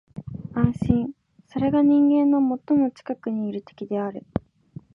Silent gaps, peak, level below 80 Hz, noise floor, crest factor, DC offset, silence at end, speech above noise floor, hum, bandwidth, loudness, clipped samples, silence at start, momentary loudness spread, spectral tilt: none; -4 dBFS; -48 dBFS; -45 dBFS; 18 dB; under 0.1%; 0.55 s; 24 dB; none; 5.6 kHz; -23 LUFS; under 0.1%; 0.15 s; 16 LU; -10 dB/octave